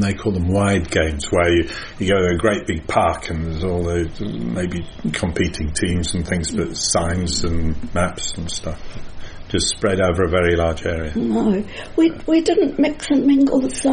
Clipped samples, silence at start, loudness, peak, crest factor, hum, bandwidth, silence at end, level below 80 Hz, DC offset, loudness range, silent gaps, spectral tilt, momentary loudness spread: under 0.1%; 0 s; -19 LUFS; -2 dBFS; 18 dB; none; 10 kHz; 0 s; -32 dBFS; under 0.1%; 4 LU; none; -5 dB/octave; 9 LU